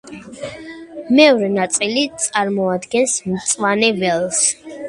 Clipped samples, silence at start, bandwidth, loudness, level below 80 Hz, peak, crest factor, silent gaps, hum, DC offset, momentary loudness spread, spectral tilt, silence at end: under 0.1%; 0.05 s; 11.5 kHz; -16 LUFS; -58 dBFS; 0 dBFS; 18 dB; none; none; under 0.1%; 19 LU; -3 dB/octave; 0 s